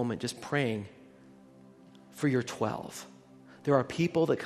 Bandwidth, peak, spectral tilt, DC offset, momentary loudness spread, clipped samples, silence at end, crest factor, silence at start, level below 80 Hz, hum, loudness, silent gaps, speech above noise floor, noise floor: 13.5 kHz; -12 dBFS; -6 dB/octave; under 0.1%; 18 LU; under 0.1%; 0 s; 20 dB; 0 s; -70 dBFS; none; -31 LUFS; none; 25 dB; -55 dBFS